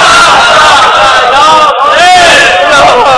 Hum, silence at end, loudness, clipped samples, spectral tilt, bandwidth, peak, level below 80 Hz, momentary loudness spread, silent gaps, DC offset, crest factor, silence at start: none; 0 s; -2 LUFS; 20%; -1 dB/octave; 11 kHz; 0 dBFS; -32 dBFS; 3 LU; none; under 0.1%; 2 dB; 0 s